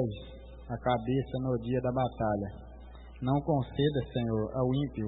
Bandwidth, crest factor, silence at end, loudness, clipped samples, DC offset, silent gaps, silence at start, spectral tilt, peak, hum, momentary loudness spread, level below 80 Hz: 4 kHz; 16 dB; 0 s; -32 LUFS; under 0.1%; under 0.1%; none; 0 s; -11.5 dB/octave; -14 dBFS; none; 19 LU; -48 dBFS